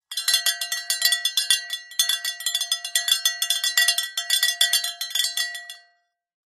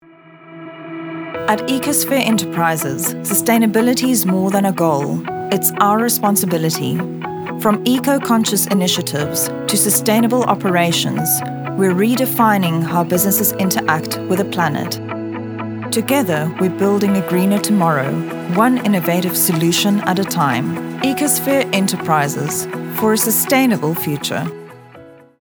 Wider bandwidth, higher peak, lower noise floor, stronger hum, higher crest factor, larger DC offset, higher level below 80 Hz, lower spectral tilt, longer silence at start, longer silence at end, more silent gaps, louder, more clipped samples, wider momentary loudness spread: second, 13.5 kHz vs over 20 kHz; about the same, -2 dBFS vs 0 dBFS; first, -66 dBFS vs -43 dBFS; neither; first, 22 dB vs 16 dB; neither; second, -80 dBFS vs -60 dBFS; second, 6.5 dB/octave vs -4.5 dB/octave; second, 0.1 s vs 0.4 s; first, 0.8 s vs 0.3 s; neither; second, -21 LUFS vs -16 LUFS; neither; about the same, 7 LU vs 9 LU